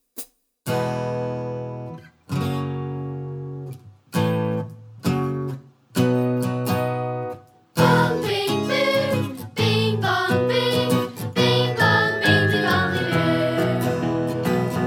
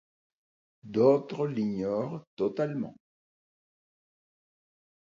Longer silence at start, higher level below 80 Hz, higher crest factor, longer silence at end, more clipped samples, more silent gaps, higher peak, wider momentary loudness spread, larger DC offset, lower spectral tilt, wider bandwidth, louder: second, 0.15 s vs 0.85 s; first, -58 dBFS vs -72 dBFS; about the same, 18 dB vs 20 dB; second, 0 s vs 2.2 s; neither; second, none vs 2.27-2.37 s; first, -4 dBFS vs -12 dBFS; first, 16 LU vs 13 LU; neither; second, -6 dB/octave vs -8.5 dB/octave; first, over 20 kHz vs 7.2 kHz; first, -22 LUFS vs -29 LUFS